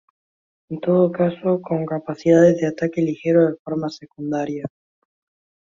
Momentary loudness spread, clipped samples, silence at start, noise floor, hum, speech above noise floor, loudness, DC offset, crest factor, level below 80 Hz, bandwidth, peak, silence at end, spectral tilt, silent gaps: 15 LU; under 0.1%; 0.7 s; under -90 dBFS; none; over 71 dB; -20 LUFS; under 0.1%; 18 dB; -62 dBFS; 7.4 kHz; -2 dBFS; 1 s; -8 dB/octave; 3.59-3.65 s